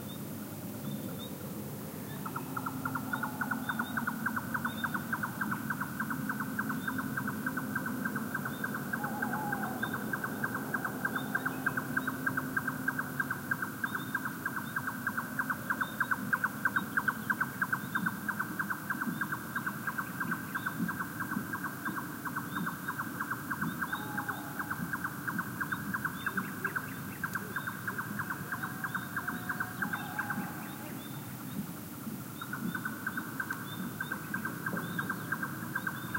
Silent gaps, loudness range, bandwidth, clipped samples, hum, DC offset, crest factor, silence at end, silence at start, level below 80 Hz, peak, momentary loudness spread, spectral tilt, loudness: none; 5 LU; 16 kHz; under 0.1%; none; under 0.1%; 20 dB; 0 s; 0 s; -68 dBFS; -16 dBFS; 7 LU; -4.5 dB/octave; -36 LUFS